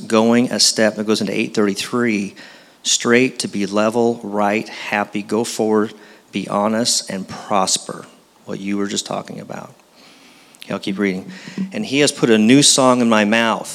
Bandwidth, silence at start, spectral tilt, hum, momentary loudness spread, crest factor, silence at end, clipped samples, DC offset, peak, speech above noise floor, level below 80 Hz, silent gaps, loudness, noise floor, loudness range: 15.5 kHz; 0 s; -3 dB/octave; none; 15 LU; 18 dB; 0 s; under 0.1%; under 0.1%; 0 dBFS; 29 dB; -72 dBFS; none; -17 LUFS; -47 dBFS; 10 LU